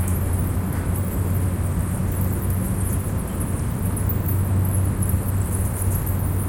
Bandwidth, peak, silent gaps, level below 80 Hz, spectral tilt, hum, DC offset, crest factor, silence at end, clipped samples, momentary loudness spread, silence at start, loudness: 17 kHz; -8 dBFS; none; -30 dBFS; -6.5 dB/octave; none; under 0.1%; 14 dB; 0 s; under 0.1%; 3 LU; 0 s; -23 LUFS